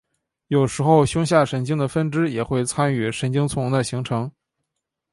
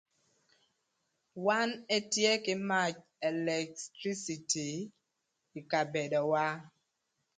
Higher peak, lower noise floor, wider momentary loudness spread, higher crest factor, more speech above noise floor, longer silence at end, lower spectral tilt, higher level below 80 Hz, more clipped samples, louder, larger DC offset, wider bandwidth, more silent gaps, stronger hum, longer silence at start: first, -4 dBFS vs -14 dBFS; about the same, -81 dBFS vs -83 dBFS; second, 7 LU vs 13 LU; about the same, 18 dB vs 22 dB; first, 60 dB vs 50 dB; first, 0.85 s vs 0.7 s; first, -6 dB/octave vs -3 dB/octave; first, -50 dBFS vs -80 dBFS; neither; first, -21 LUFS vs -33 LUFS; neither; first, 11.5 kHz vs 9.6 kHz; neither; neither; second, 0.5 s vs 1.35 s